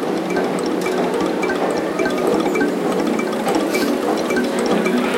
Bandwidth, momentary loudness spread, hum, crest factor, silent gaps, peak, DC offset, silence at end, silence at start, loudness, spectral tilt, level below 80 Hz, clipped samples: 17 kHz; 2 LU; none; 14 dB; none; -4 dBFS; under 0.1%; 0 s; 0 s; -19 LUFS; -5 dB/octave; -54 dBFS; under 0.1%